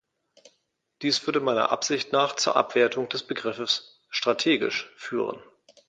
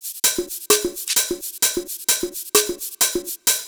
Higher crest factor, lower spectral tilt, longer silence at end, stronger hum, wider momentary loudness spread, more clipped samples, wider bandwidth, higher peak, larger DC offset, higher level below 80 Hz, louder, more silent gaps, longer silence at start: about the same, 22 dB vs 22 dB; first, -2.5 dB/octave vs 0 dB/octave; first, 0.45 s vs 0 s; neither; first, 9 LU vs 5 LU; neither; second, 9.4 kHz vs over 20 kHz; second, -4 dBFS vs 0 dBFS; neither; second, -72 dBFS vs -52 dBFS; second, -25 LUFS vs -20 LUFS; neither; first, 1 s vs 0 s